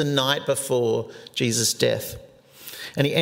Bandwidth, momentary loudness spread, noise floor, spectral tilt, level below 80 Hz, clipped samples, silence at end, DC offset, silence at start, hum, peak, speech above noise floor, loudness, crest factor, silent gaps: 16.5 kHz; 16 LU; -43 dBFS; -3.5 dB/octave; -58 dBFS; under 0.1%; 0 s; under 0.1%; 0 s; none; -4 dBFS; 20 dB; -23 LUFS; 20 dB; none